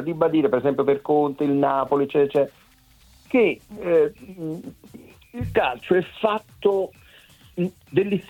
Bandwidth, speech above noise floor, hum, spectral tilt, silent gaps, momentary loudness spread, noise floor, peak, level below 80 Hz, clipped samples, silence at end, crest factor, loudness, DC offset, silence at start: 17 kHz; 32 dB; none; -7.5 dB/octave; none; 12 LU; -54 dBFS; -6 dBFS; -54 dBFS; under 0.1%; 0.1 s; 18 dB; -22 LUFS; under 0.1%; 0 s